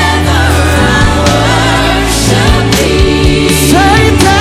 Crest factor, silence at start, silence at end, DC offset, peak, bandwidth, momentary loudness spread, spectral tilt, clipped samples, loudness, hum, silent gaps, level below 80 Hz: 8 dB; 0 s; 0 s; under 0.1%; 0 dBFS; 16 kHz; 2 LU; -4.5 dB/octave; 3%; -8 LUFS; none; none; -16 dBFS